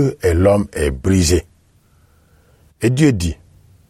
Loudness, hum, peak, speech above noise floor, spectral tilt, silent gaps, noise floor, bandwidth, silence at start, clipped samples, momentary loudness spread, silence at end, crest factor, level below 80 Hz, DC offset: -16 LUFS; none; -2 dBFS; 39 dB; -6 dB/octave; none; -54 dBFS; 15.5 kHz; 0 s; under 0.1%; 7 LU; 0.55 s; 16 dB; -30 dBFS; under 0.1%